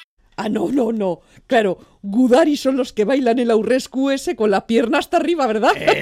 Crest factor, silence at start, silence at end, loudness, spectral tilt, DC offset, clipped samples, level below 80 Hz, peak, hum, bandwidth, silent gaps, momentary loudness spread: 14 dB; 0 s; 0 s; -18 LUFS; -5 dB/octave; under 0.1%; under 0.1%; -54 dBFS; -4 dBFS; none; 15 kHz; 0.04-0.17 s; 9 LU